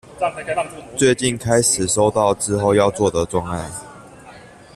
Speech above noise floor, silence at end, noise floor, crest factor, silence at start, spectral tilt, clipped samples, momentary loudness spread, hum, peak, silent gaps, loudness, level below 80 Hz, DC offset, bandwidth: 24 dB; 0.3 s; -42 dBFS; 16 dB; 0.1 s; -4 dB/octave; under 0.1%; 11 LU; none; -2 dBFS; none; -18 LUFS; -46 dBFS; under 0.1%; 14.5 kHz